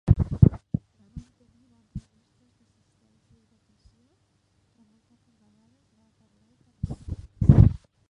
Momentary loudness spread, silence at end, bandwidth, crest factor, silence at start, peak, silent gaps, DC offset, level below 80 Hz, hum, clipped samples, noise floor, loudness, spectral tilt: 28 LU; 0.35 s; 3.9 kHz; 26 dB; 0.05 s; 0 dBFS; none; under 0.1%; -36 dBFS; none; under 0.1%; -68 dBFS; -22 LUFS; -11 dB/octave